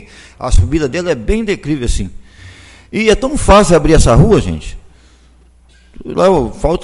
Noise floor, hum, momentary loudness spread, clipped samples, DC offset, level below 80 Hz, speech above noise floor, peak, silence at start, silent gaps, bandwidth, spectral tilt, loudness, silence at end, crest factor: -45 dBFS; none; 15 LU; under 0.1%; under 0.1%; -20 dBFS; 34 dB; 0 dBFS; 0.4 s; none; 11.5 kHz; -6 dB/octave; -12 LUFS; 0 s; 12 dB